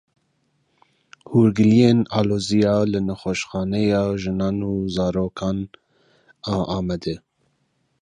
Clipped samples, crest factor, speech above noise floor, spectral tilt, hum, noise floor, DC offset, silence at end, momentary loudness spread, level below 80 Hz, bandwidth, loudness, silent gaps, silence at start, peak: under 0.1%; 18 dB; 48 dB; -7 dB/octave; none; -68 dBFS; under 0.1%; 0.85 s; 12 LU; -46 dBFS; 10.5 kHz; -21 LUFS; none; 1.3 s; -2 dBFS